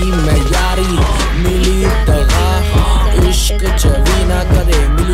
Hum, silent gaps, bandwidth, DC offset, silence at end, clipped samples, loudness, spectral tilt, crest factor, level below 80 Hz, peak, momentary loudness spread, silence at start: none; none; 15.5 kHz; under 0.1%; 0 s; under 0.1%; -13 LUFS; -5 dB/octave; 10 dB; -12 dBFS; 0 dBFS; 2 LU; 0 s